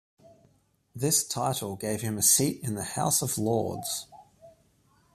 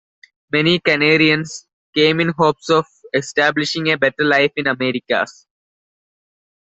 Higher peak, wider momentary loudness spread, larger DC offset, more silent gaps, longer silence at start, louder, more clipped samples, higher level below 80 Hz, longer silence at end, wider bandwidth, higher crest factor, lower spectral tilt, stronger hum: second, -8 dBFS vs 0 dBFS; first, 12 LU vs 9 LU; neither; second, none vs 1.73-1.93 s; first, 0.95 s vs 0.55 s; second, -26 LUFS vs -16 LUFS; neither; about the same, -64 dBFS vs -60 dBFS; second, 0.65 s vs 1.4 s; first, 15.5 kHz vs 8.2 kHz; about the same, 22 dB vs 18 dB; about the same, -3.5 dB/octave vs -4.5 dB/octave; neither